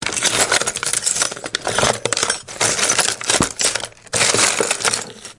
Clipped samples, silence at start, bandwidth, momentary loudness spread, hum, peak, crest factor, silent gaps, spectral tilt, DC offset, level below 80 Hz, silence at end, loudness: under 0.1%; 0 s; 12 kHz; 6 LU; none; 0 dBFS; 20 dB; none; -0.5 dB/octave; under 0.1%; -48 dBFS; 0.05 s; -17 LUFS